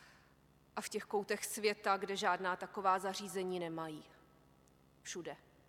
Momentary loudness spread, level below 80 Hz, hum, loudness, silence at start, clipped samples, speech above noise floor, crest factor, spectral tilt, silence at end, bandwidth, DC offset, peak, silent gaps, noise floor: 13 LU; -76 dBFS; 50 Hz at -70 dBFS; -39 LUFS; 0 s; under 0.1%; 29 dB; 22 dB; -3 dB/octave; 0.3 s; 17 kHz; under 0.1%; -20 dBFS; none; -68 dBFS